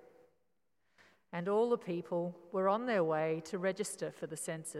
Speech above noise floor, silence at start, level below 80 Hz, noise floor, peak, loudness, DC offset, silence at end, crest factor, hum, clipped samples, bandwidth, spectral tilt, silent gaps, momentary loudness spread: 48 dB; 1.35 s; -90 dBFS; -83 dBFS; -18 dBFS; -36 LUFS; under 0.1%; 0 s; 18 dB; none; under 0.1%; 14 kHz; -5 dB/octave; none; 9 LU